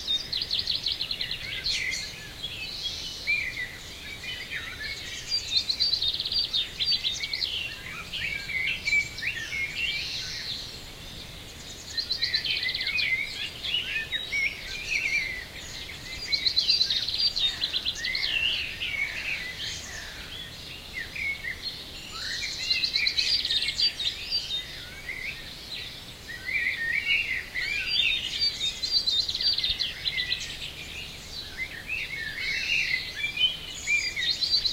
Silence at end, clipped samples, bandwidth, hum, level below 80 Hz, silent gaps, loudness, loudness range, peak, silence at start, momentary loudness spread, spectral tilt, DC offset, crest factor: 0 s; under 0.1%; 16 kHz; none; -50 dBFS; none; -27 LUFS; 5 LU; -10 dBFS; 0 s; 14 LU; -0.5 dB/octave; under 0.1%; 20 dB